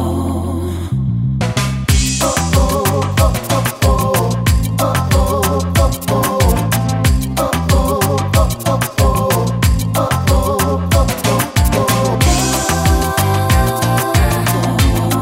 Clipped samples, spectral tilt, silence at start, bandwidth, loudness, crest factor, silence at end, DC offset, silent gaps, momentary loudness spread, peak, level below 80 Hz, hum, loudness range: under 0.1%; -5 dB/octave; 0 s; 16.5 kHz; -15 LUFS; 14 dB; 0 s; under 0.1%; none; 3 LU; 0 dBFS; -20 dBFS; none; 1 LU